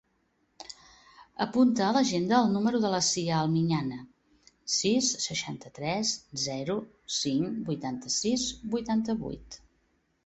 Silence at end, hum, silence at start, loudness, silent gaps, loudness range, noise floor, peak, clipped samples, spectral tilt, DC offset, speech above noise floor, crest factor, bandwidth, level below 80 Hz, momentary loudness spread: 0.7 s; none; 0.6 s; -28 LUFS; none; 4 LU; -72 dBFS; -10 dBFS; under 0.1%; -4 dB/octave; under 0.1%; 44 dB; 20 dB; 8.4 kHz; -60 dBFS; 19 LU